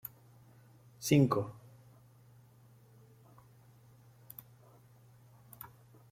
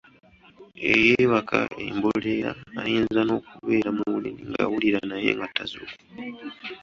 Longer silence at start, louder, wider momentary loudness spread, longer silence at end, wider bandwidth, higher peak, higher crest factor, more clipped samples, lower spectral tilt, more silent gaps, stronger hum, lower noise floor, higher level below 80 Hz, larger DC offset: first, 1 s vs 0.6 s; second, -31 LUFS vs -24 LUFS; first, 25 LU vs 18 LU; first, 0.45 s vs 0.05 s; first, 16 kHz vs 7.4 kHz; second, -14 dBFS vs -4 dBFS; about the same, 24 dB vs 22 dB; neither; about the same, -6 dB/octave vs -6 dB/octave; neither; neither; first, -61 dBFS vs -51 dBFS; second, -72 dBFS vs -58 dBFS; neither